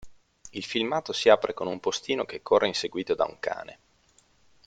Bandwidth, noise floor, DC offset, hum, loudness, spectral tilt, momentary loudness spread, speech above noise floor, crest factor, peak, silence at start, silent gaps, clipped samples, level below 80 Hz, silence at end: 9.2 kHz; -63 dBFS; under 0.1%; none; -26 LUFS; -3.5 dB/octave; 15 LU; 37 dB; 24 dB; -4 dBFS; 0 s; none; under 0.1%; -64 dBFS; 0.95 s